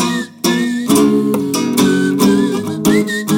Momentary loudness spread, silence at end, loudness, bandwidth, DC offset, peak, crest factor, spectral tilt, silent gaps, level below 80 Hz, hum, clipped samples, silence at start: 5 LU; 0 s; -14 LUFS; 17.5 kHz; under 0.1%; -2 dBFS; 12 dB; -4.5 dB/octave; none; -48 dBFS; none; under 0.1%; 0 s